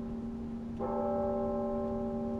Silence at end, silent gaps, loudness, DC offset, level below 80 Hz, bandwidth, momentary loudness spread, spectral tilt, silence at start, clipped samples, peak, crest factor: 0 s; none; -35 LUFS; under 0.1%; -50 dBFS; 6.2 kHz; 7 LU; -9.5 dB/octave; 0 s; under 0.1%; -22 dBFS; 12 dB